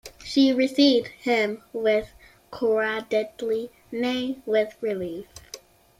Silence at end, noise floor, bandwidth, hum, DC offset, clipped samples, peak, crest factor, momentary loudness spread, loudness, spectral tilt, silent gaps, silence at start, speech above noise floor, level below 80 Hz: 0.45 s; -46 dBFS; 15 kHz; none; under 0.1%; under 0.1%; -8 dBFS; 18 dB; 20 LU; -24 LUFS; -4.5 dB/octave; none; 0.05 s; 23 dB; -60 dBFS